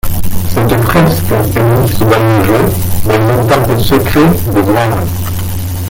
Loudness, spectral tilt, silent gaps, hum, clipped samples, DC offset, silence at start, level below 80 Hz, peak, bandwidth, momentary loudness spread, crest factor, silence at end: -10 LUFS; -6.5 dB/octave; none; none; under 0.1%; under 0.1%; 0.05 s; -24 dBFS; 0 dBFS; 17.5 kHz; 8 LU; 8 dB; 0 s